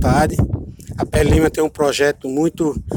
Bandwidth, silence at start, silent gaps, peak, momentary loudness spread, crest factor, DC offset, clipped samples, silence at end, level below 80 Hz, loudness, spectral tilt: 17.5 kHz; 0 s; none; -2 dBFS; 9 LU; 16 dB; under 0.1%; under 0.1%; 0 s; -28 dBFS; -18 LUFS; -6 dB/octave